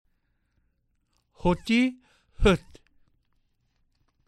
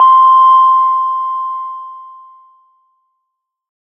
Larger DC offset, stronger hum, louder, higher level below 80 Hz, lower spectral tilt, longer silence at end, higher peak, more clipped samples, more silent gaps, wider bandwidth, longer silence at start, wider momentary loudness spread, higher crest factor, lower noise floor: neither; neither; second, -25 LUFS vs -9 LUFS; first, -40 dBFS vs under -90 dBFS; first, -6 dB/octave vs -0.5 dB/octave; about the same, 1.7 s vs 1.75 s; second, -8 dBFS vs 0 dBFS; neither; neither; first, 12 kHz vs 5.6 kHz; first, 1.45 s vs 0 s; second, 5 LU vs 20 LU; first, 22 dB vs 12 dB; about the same, -72 dBFS vs -74 dBFS